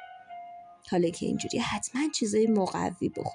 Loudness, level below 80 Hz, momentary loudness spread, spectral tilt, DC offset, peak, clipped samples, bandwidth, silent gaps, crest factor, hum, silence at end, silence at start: -29 LUFS; -62 dBFS; 20 LU; -4.5 dB/octave; under 0.1%; -16 dBFS; under 0.1%; 11.5 kHz; none; 14 dB; none; 0 s; 0 s